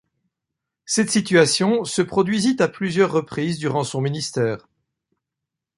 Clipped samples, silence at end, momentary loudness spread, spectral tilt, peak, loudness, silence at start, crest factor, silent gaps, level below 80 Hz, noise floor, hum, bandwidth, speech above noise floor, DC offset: under 0.1%; 1.2 s; 8 LU; -4.5 dB/octave; -2 dBFS; -20 LUFS; 0.9 s; 18 dB; none; -60 dBFS; -84 dBFS; none; 11.5 kHz; 64 dB; under 0.1%